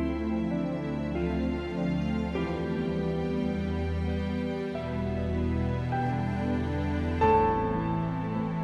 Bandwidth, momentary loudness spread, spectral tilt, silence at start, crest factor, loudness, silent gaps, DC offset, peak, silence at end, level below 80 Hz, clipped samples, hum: 8.4 kHz; 5 LU; -8.5 dB/octave; 0 s; 16 dB; -30 LUFS; none; under 0.1%; -12 dBFS; 0 s; -40 dBFS; under 0.1%; none